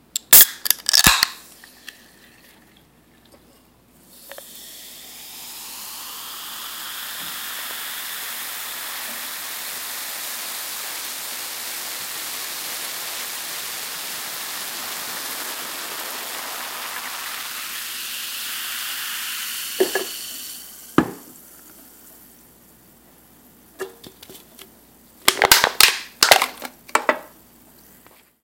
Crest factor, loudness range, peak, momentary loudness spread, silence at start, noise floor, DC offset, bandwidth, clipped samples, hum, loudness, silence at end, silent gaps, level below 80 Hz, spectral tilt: 24 dB; 20 LU; 0 dBFS; 23 LU; 0.15 s; -54 dBFS; under 0.1%; 17 kHz; under 0.1%; none; -20 LUFS; 1.1 s; none; -52 dBFS; -0.5 dB/octave